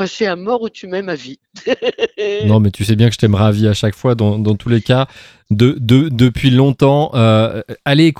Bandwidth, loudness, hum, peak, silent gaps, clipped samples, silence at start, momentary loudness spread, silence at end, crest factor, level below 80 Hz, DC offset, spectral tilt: 13.5 kHz; -14 LUFS; none; 0 dBFS; none; under 0.1%; 0 s; 11 LU; 0.05 s; 14 dB; -42 dBFS; under 0.1%; -7 dB/octave